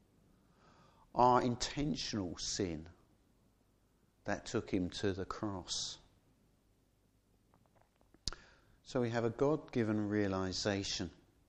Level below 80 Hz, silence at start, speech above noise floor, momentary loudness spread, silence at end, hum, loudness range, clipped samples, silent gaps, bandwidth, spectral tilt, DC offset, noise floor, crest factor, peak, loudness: -60 dBFS; 1.15 s; 37 dB; 12 LU; 0.35 s; none; 9 LU; under 0.1%; none; 10.5 kHz; -4.5 dB/octave; under 0.1%; -73 dBFS; 24 dB; -16 dBFS; -37 LUFS